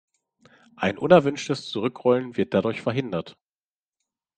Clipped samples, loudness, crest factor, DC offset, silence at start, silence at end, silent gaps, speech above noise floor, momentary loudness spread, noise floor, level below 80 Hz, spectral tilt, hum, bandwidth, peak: under 0.1%; -23 LUFS; 24 dB; under 0.1%; 0.8 s; 1.05 s; none; over 67 dB; 12 LU; under -90 dBFS; -64 dBFS; -6 dB/octave; none; 9.2 kHz; -2 dBFS